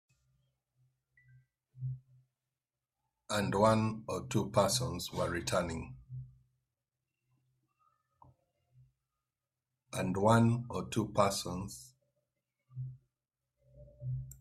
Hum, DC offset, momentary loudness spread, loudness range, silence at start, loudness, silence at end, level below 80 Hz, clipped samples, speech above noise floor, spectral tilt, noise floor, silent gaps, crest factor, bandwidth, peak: none; under 0.1%; 19 LU; 12 LU; 1.75 s; -33 LUFS; 0.05 s; -62 dBFS; under 0.1%; over 58 dB; -5.5 dB/octave; under -90 dBFS; none; 24 dB; 15 kHz; -12 dBFS